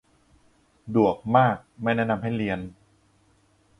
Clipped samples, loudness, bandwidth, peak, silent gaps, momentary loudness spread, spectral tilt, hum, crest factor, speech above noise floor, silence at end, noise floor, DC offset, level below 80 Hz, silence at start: under 0.1%; -24 LUFS; 10.5 kHz; -6 dBFS; none; 9 LU; -8.5 dB/octave; none; 22 dB; 39 dB; 1.1 s; -63 dBFS; under 0.1%; -56 dBFS; 0.85 s